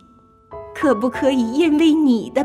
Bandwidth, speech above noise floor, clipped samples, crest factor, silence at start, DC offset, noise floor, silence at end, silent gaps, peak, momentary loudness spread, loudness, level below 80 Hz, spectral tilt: 12.5 kHz; 34 dB; under 0.1%; 14 dB; 0.5 s; under 0.1%; -50 dBFS; 0 s; none; -4 dBFS; 11 LU; -17 LUFS; -52 dBFS; -5.5 dB/octave